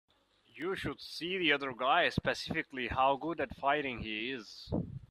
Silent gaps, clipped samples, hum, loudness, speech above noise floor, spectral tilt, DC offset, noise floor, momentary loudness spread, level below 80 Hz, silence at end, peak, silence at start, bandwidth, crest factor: none; under 0.1%; none; -34 LUFS; 31 dB; -5 dB/octave; under 0.1%; -65 dBFS; 10 LU; -58 dBFS; 0.1 s; -14 dBFS; 0.55 s; 14 kHz; 22 dB